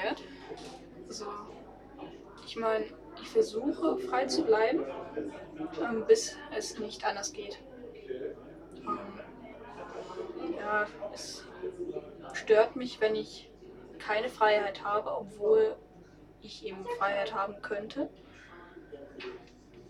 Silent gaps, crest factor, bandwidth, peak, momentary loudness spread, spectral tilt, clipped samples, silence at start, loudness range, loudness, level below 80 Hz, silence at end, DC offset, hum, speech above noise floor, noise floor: none; 22 dB; 12 kHz; -10 dBFS; 22 LU; -3.5 dB/octave; under 0.1%; 0 s; 8 LU; -32 LUFS; -62 dBFS; 0 s; under 0.1%; none; 23 dB; -55 dBFS